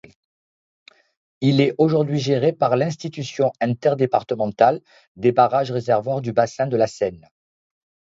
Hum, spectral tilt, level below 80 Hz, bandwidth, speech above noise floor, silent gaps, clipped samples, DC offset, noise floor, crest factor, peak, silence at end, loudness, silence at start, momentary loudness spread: none; -7 dB/octave; -62 dBFS; 7.8 kHz; over 70 dB; 5.07-5.15 s; under 0.1%; under 0.1%; under -90 dBFS; 20 dB; 0 dBFS; 1 s; -20 LUFS; 1.4 s; 8 LU